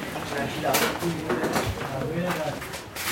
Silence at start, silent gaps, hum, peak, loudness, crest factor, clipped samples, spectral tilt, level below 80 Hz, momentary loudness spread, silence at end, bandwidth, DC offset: 0 s; none; none; -10 dBFS; -27 LUFS; 18 dB; under 0.1%; -4 dB/octave; -48 dBFS; 8 LU; 0 s; 17 kHz; under 0.1%